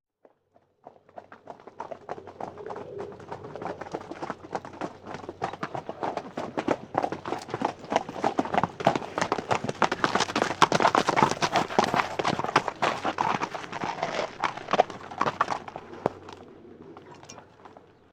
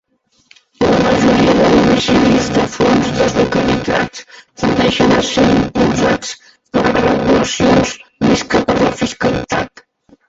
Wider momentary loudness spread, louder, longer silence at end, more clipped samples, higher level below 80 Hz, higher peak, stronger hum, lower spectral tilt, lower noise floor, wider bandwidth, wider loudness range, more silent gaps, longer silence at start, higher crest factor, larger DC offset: first, 22 LU vs 9 LU; second, -28 LUFS vs -13 LUFS; second, 0.35 s vs 0.6 s; neither; second, -64 dBFS vs -36 dBFS; second, -4 dBFS vs 0 dBFS; neither; about the same, -4 dB/octave vs -5 dB/octave; first, -66 dBFS vs -51 dBFS; first, 17 kHz vs 8 kHz; first, 14 LU vs 2 LU; neither; about the same, 0.85 s vs 0.8 s; first, 26 dB vs 14 dB; neither